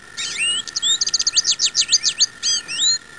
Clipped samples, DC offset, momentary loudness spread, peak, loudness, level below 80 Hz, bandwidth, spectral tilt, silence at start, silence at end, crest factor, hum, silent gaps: under 0.1%; 0.3%; 5 LU; -6 dBFS; -17 LUFS; -58 dBFS; 11 kHz; 3 dB/octave; 0 s; 0 s; 14 dB; none; none